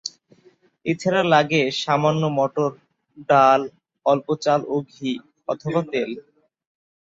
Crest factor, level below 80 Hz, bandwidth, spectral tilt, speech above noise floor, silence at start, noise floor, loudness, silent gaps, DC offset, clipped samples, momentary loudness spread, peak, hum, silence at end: 20 dB; -66 dBFS; 7.8 kHz; -5.5 dB/octave; 37 dB; 0.05 s; -57 dBFS; -21 LUFS; none; under 0.1%; under 0.1%; 14 LU; -2 dBFS; none; 0.85 s